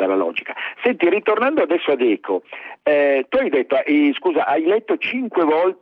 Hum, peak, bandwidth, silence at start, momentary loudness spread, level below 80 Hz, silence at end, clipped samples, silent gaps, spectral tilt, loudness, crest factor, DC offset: none; -4 dBFS; 5.2 kHz; 0 s; 8 LU; -66 dBFS; 0.1 s; under 0.1%; none; -7.5 dB/octave; -19 LUFS; 14 dB; under 0.1%